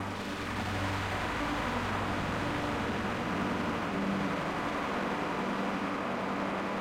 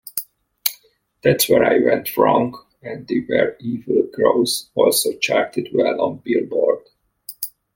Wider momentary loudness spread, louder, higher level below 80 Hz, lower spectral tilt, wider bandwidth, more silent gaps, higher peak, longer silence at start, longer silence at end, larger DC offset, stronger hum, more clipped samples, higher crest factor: second, 1 LU vs 14 LU; second, -33 LUFS vs -19 LUFS; first, -50 dBFS vs -60 dBFS; first, -5.5 dB/octave vs -4 dB/octave; about the same, 16.5 kHz vs 17 kHz; neither; second, -20 dBFS vs 0 dBFS; second, 0 s vs 0.15 s; second, 0 s vs 0.25 s; neither; neither; neither; about the same, 14 dB vs 18 dB